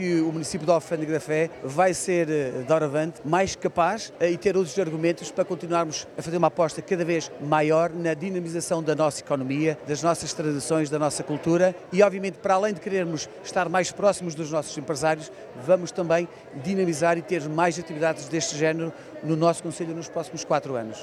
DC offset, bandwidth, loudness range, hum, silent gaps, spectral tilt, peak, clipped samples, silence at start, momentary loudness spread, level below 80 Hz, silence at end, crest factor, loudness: under 0.1%; 13.5 kHz; 2 LU; none; none; -5 dB/octave; -6 dBFS; under 0.1%; 0 s; 7 LU; -62 dBFS; 0 s; 18 dB; -25 LUFS